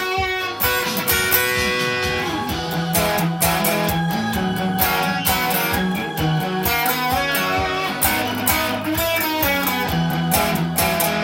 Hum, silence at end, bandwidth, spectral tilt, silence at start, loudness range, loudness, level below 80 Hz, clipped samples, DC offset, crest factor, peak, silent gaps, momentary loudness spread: none; 0 s; 17 kHz; -3.5 dB/octave; 0 s; 1 LU; -19 LUFS; -40 dBFS; under 0.1%; under 0.1%; 18 dB; 0 dBFS; none; 4 LU